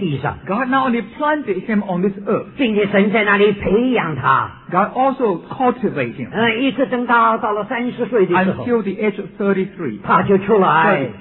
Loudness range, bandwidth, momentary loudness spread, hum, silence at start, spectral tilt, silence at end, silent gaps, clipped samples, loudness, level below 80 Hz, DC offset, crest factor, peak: 2 LU; 4.2 kHz; 8 LU; none; 0 s; -10.5 dB/octave; 0 s; none; under 0.1%; -17 LUFS; -48 dBFS; under 0.1%; 16 dB; 0 dBFS